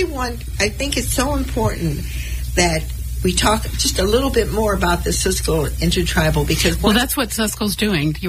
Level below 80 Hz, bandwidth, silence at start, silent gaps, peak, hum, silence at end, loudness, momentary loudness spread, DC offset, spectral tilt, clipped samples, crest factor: -26 dBFS; 16 kHz; 0 s; none; -2 dBFS; none; 0 s; -18 LUFS; 7 LU; under 0.1%; -4 dB/octave; under 0.1%; 16 dB